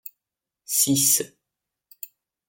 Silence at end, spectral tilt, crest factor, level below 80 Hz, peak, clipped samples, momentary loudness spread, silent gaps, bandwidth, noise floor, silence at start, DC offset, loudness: 1.2 s; -2.5 dB/octave; 22 dB; -70 dBFS; -6 dBFS; under 0.1%; 23 LU; none; 17 kHz; -87 dBFS; 0.7 s; under 0.1%; -19 LUFS